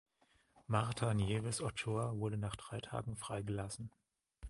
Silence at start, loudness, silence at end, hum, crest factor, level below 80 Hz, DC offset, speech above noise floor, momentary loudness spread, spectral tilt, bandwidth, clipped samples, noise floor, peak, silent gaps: 0.55 s; -40 LUFS; 0 s; none; 22 dB; -58 dBFS; under 0.1%; 35 dB; 9 LU; -5.5 dB/octave; 11.5 kHz; under 0.1%; -74 dBFS; -18 dBFS; none